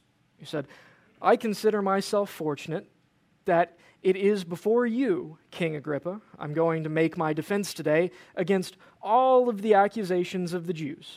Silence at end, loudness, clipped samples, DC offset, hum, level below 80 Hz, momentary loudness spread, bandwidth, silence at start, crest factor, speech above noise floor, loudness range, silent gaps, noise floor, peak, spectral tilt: 0 s; -27 LUFS; under 0.1%; under 0.1%; none; -74 dBFS; 13 LU; 16 kHz; 0.4 s; 20 dB; 40 dB; 3 LU; none; -66 dBFS; -8 dBFS; -6 dB/octave